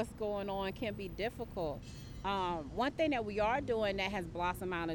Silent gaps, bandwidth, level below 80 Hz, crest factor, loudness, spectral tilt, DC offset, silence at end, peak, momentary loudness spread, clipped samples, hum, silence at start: none; 18 kHz; -52 dBFS; 14 dB; -37 LUFS; -5.5 dB/octave; under 0.1%; 0 s; -22 dBFS; 7 LU; under 0.1%; none; 0 s